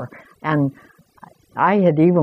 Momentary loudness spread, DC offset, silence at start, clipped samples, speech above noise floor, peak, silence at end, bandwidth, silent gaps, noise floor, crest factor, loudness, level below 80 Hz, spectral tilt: 17 LU; under 0.1%; 0 s; under 0.1%; 30 dB; -4 dBFS; 0 s; 5.8 kHz; none; -48 dBFS; 16 dB; -18 LUFS; -62 dBFS; -10 dB/octave